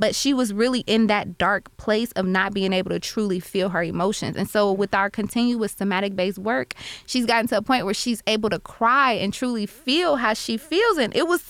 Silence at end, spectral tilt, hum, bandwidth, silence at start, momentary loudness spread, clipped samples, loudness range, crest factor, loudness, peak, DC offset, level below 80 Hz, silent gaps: 0 s; -4 dB/octave; none; 17 kHz; 0 s; 6 LU; under 0.1%; 2 LU; 14 dB; -22 LUFS; -8 dBFS; under 0.1%; -52 dBFS; none